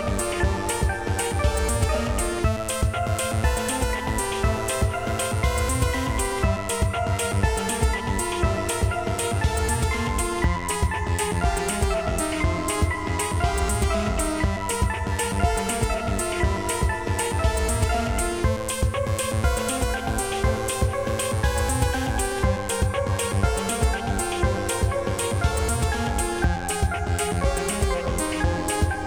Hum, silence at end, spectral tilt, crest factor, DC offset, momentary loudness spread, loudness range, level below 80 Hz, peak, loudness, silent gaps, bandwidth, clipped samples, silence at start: none; 0 s; -4.5 dB/octave; 16 dB; 0.2%; 2 LU; 0 LU; -28 dBFS; -8 dBFS; -24 LUFS; none; over 20 kHz; under 0.1%; 0 s